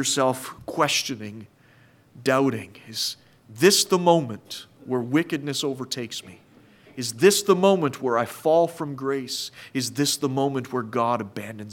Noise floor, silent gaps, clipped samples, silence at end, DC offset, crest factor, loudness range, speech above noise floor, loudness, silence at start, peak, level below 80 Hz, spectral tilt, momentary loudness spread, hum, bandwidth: -55 dBFS; none; under 0.1%; 0 s; under 0.1%; 20 dB; 4 LU; 32 dB; -23 LUFS; 0 s; -4 dBFS; -70 dBFS; -4 dB/octave; 16 LU; none; 18 kHz